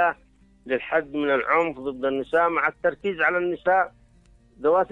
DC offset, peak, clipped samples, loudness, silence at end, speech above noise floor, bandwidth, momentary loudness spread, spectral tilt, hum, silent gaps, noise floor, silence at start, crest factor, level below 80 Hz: under 0.1%; -8 dBFS; under 0.1%; -24 LUFS; 0.05 s; 33 dB; 7.4 kHz; 7 LU; -6.5 dB/octave; none; none; -56 dBFS; 0 s; 16 dB; -58 dBFS